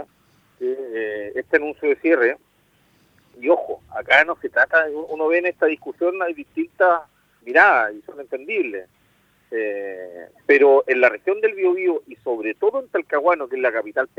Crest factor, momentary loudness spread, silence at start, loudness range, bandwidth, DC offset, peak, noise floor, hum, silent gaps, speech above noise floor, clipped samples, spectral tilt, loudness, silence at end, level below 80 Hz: 20 dB; 15 LU; 0 s; 3 LU; 7.4 kHz; under 0.1%; 0 dBFS; -60 dBFS; none; none; 40 dB; under 0.1%; -5 dB/octave; -20 LUFS; 0.15 s; -68 dBFS